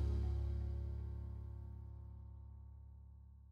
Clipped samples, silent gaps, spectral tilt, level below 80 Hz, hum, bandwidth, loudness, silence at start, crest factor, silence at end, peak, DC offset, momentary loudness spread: under 0.1%; none; -9.5 dB/octave; -46 dBFS; none; 5.2 kHz; -46 LUFS; 0 s; 14 dB; 0 s; -30 dBFS; under 0.1%; 18 LU